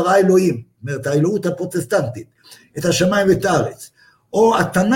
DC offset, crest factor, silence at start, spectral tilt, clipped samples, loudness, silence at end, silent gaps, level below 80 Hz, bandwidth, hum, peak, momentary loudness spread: under 0.1%; 16 dB; 0 s; -5.5 dB/octave; under 0.1%; -17 LUFS; 0 s; none; -50 dBFS; 17 kHz; none; -2 dBFS; 13 LU